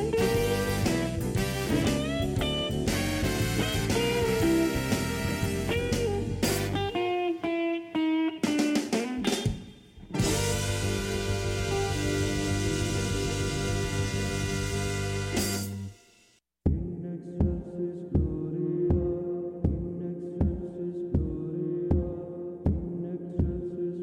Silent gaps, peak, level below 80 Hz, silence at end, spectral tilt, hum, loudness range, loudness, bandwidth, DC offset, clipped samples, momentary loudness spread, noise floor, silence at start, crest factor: none; -12 dBFS; -40 dBFS; 0 s; -5 dB/octave; none; 4 LU; -29 LUFS; 16.5 kHz; under 0.1%; under 0.1%; 7 LU; -64 dBFS; 0 s; 16 dB